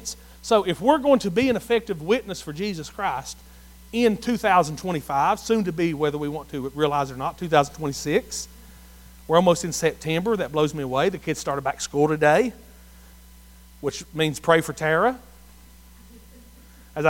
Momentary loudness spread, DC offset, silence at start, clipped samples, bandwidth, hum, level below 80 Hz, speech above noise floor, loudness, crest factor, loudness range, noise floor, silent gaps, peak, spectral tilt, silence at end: 12 LU; under 0.1%; 0 s; under 0.1%; 17 kHz; none; -48 dBFS; 26 dB; -23 LUFS; 20 dB; 3 LU; -48 dBFS; none; -2 dBFS; -5 dB/octave; 0 s